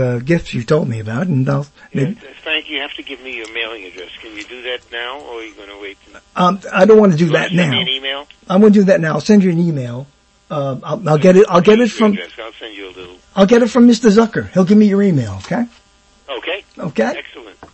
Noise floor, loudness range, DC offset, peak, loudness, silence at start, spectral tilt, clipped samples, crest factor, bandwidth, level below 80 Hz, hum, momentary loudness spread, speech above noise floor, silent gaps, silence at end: -50 dBFS; 11 LU; under 0.1%; 0 dBFS; -14 LUFS; 0 s; -6.5 dB/octave; under 0.1%; 14 dB; 8.6 kHz; -48 dBFS; none; 21 LU; 36 dB; none; 0.1 s